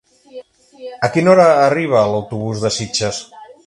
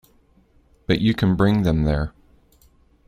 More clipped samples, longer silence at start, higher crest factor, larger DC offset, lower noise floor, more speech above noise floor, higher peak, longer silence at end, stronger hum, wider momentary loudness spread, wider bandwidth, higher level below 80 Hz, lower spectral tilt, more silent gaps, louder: neither; second, 0.35 s vs 0.9 s; about the same, 16 dB vs 18 dB; neither; second, -38 dBFS vs -57 dBFS; second, 24 dB vs 39 dB; first, 0 dBFS vs -4 dBFS; second, 0.15 s vs 1 s; neither; first, 15 LU vs 11 LU; second, 11.5 kHz vs 15 kHz; second, -52 dBFS vs -36 dBFS; second, -5 dB/octave vs -8 dB/octave; neither; first, -15 LUFS vs -20 LUFS